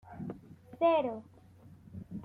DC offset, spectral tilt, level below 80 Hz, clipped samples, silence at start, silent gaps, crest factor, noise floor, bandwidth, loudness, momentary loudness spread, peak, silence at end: under 0.1%; -8.5 dB/octave; -68 dBFS; under 0.1%; 0.05 s; none; 18 dB; -56 dBFS; 4.6 kHz; -32 LUFS; 22 LU; -16 dBFS; 0 s